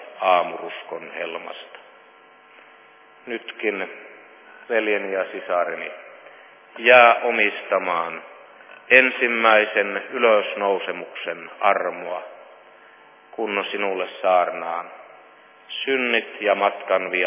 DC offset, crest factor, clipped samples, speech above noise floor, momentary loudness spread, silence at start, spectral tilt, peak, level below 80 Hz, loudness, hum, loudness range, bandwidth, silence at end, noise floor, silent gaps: under 0.1%; 22 dB; under 0.1%; 29 dB; 18 LU; 0 s; -6.5 dB/octave; 0 dBFS; -88 dBFS; -20 LUFS; none; 12 LU; 3.8 kHz; 0 s; -50 dBFS; none